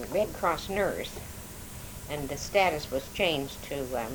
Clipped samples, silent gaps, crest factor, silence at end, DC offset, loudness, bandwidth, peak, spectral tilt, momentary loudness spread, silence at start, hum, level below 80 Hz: under 0.1%; none; 20 dB; 0 s; under 0.1%; -30 LUFS; over 20 kHz; -10 dBFS; -4 dB/octave; 16 LU; 0 s; none; -48 dBFS